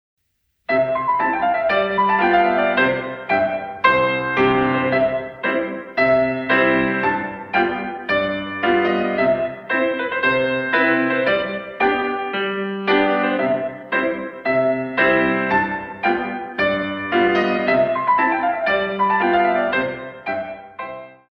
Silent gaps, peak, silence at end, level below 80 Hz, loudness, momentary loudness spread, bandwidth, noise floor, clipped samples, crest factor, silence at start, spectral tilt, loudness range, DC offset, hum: none; -2 dBFS; 0.2 s; -52 dBFS; -19 LUFS; 8 LU; 6 kHz; -69 dBFS; under 0.1%; 18 dB; 0.7 s; -7.5 dB/octave; 2 LU; under 0.1%; none